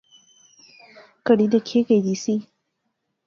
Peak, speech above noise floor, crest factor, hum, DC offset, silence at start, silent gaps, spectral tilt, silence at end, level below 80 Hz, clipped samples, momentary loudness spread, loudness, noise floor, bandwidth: -4 dBFS; 57 dB; 20 dB; none; under 0.1%; 1.25 s; none; -6 dB/octave; 0.85 s; -70 dBFS; under 0.1%; 9 LU; -21 LUFS; -76 dBFS; 7.4 kHz